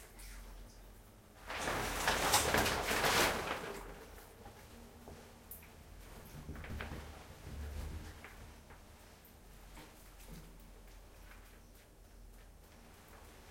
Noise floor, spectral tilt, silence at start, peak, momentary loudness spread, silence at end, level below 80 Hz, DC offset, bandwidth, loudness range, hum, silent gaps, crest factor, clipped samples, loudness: -59 dBFS; -2.5 dB/octave; 0 s; -14 dBFS; 27 LU; 0 s; -54 dBFS; under 0.1%; 16.5 kHz; 23 LU; none; none; 26 dB; under 0.1%; -36 LUFS